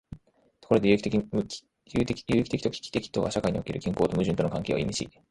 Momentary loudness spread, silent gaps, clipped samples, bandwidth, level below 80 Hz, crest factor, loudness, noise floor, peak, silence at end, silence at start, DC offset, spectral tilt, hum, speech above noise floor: 9 LU; none; under 0.1%; 11.5 kHz; -50 dBFS; 20 dB; -28 LUFS; -60 dBFS; -6 dBFS; 0.2 s; 0.1 s; under 0.1%; -6 dB/octave; none; 33 dB